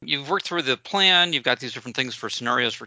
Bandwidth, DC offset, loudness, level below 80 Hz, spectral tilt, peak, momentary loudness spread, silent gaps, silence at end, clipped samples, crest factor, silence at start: 8 kHz; under 0.1%; -21 LUFS; -70 dBFS; -2.5 dB/octave; -4 dBFS; 11 LU; none; 0 s; under 0.1%; 20 dB; 0 s